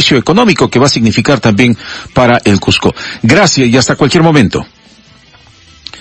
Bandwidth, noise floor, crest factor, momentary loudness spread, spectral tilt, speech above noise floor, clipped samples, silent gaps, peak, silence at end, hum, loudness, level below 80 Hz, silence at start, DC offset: 11 kHz; -41 dBFS; 10 dB; 8 LU; -5 dB/octave; 33 dB; 1%; none; 0 dBFS; 0 s; none; -9 LUFS; -36 dBFS; 0 s; under 0.1%